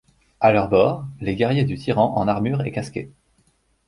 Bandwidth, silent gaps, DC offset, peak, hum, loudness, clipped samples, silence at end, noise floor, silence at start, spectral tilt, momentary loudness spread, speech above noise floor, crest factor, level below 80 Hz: 11 kHz; none; under 0.1%; -2 dBFS; none; -20 LUFS; under 0.1%; 0.8 s; -63 dBFS; 0.4 s; -8 dB/octave; 12 LU; 43 dB; 18 dB; -48 dBFS